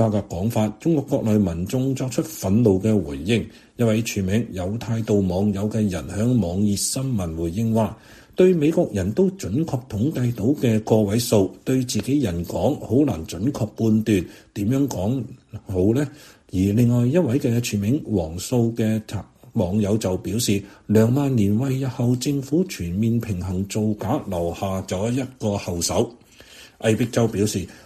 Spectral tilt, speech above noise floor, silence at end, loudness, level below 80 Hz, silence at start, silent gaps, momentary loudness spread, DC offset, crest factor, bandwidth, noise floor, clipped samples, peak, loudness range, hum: -6.5 dB/octave; 25 dB; 0.1 s; -22 LUFS; -46 dBFS; 0 s; none; 7 LU; under 0.1%; 18 dB; 14.5 kHz; -46 dBFS; under 0.1%; -4 dBFS; 3 LU; none